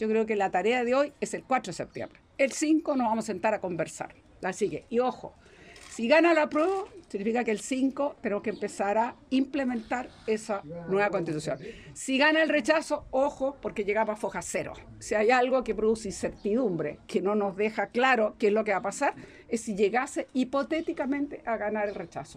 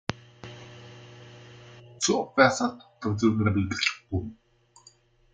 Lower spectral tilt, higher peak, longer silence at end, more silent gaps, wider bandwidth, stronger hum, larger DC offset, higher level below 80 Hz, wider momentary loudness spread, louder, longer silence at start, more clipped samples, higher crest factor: about the same, -4.5 dB/octave vs -4.5 dB/octave; second, -10 dBFS vs -4 dBFS; second, 0 s vs 1 s; neither; first, 14.5 kHz vs 9.6 kHz; neither; neither; about the same, -60 dBFS vs -60 dBFS; second, 11 LU vs 26 LU; about the same, -28 LUFS vs -26 LUFS; about the same, 0 s vs 0.1 s; neither; second, 18 dB vs 26 dB